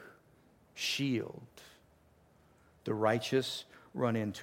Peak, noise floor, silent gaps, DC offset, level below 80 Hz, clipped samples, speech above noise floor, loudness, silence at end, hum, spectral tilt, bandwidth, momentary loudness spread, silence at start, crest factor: -16 dBFS; -65 dBFS; none; under 0.1%; -72 dBFS; under 0.1%; 32 dB; -34 LUFS; 0 s; none; -5 dB/octave; 16.5 kHz; 21 LU; 0 s; 22 dB